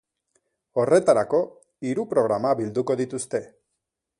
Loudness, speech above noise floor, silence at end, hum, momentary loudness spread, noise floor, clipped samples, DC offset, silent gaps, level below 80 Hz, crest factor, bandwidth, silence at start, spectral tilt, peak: -24 LUFS; 59 dB; 0.75 s; none; 11 LU; -81 dBFS; under 0.1%; under 0.1%; none; -66 dBFS; 20 dB; 11.5 kHz; 0.75 s; -6 dB/octave; -4 dBFS